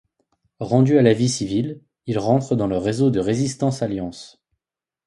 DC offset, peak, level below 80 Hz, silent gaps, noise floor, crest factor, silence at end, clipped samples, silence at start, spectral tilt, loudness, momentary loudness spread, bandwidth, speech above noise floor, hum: under 0.1%; -2 dBFS; -52 dBFS; none; -87 dBFS; 20 dB; 0.8 s; under 0.1%; 0.6 s; -6.5 dB/octave; -20 LUFS; 15 LU; 11.5 kHz; 68 dB; none